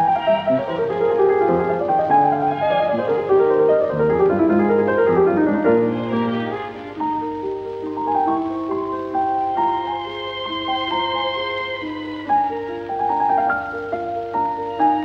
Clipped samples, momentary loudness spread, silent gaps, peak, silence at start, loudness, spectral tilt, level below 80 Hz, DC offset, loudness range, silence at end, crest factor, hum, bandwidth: under 0.1%; 10 LU; none; -4 dBFS; 0 s; -20 LUFS; -7.5 dB/octave; -52 dBFS; under 0.1%; 6 LU; 0 s; 14 dB; none; 6.4 kHz